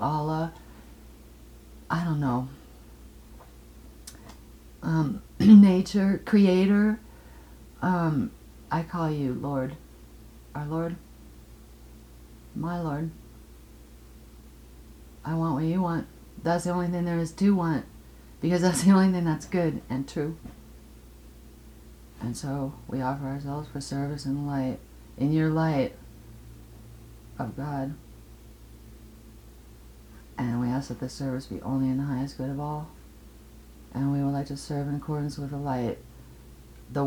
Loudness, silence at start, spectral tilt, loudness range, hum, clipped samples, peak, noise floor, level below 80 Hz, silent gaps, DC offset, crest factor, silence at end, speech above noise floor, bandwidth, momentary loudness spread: -27 LUFS; 0 s; -7 dB/octave; 16 LU; none; under 0.1%; -4 dBFS; -49 dBFS; -50 dBFS; none; under 0.1%; 24 dB; 0 s; 24 dB; 18.5 kHz; 22 LU